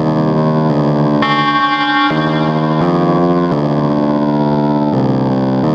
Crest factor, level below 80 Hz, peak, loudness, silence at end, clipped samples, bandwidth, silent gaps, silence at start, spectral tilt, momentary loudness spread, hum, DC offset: 12 dB; -44 dBFS; -2 dBFS; -13 LUFS; 0 s; under 0.1%; 7 kHz; none; 0 s; -8 dB/octave; 2 LU; none; under 0.1%